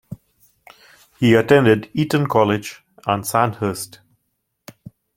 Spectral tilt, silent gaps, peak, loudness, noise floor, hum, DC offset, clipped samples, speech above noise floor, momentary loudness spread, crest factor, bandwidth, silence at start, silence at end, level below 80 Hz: -6 dB/octave; none; -2 dBFS; -18 LUFS; -73 dBFS; none; under 0.1%; under 0.1%; 56 dB; 20 LU; 18 dB; 16.5 kHz; 0.1 s; 1.3 s; -54 dBFS